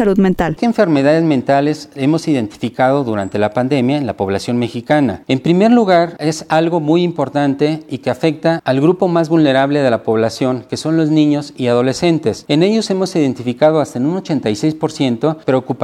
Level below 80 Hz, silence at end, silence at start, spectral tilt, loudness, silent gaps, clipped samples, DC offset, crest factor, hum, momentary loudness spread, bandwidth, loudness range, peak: -48 dBFS; 0 s; 0 s; -6.5 dB/octave; -15 LUFS; none; under 0.1%; under 0.1%; 14 dB; none; 6 LU; 12.5 kHz; 2 LU; 0 dBFS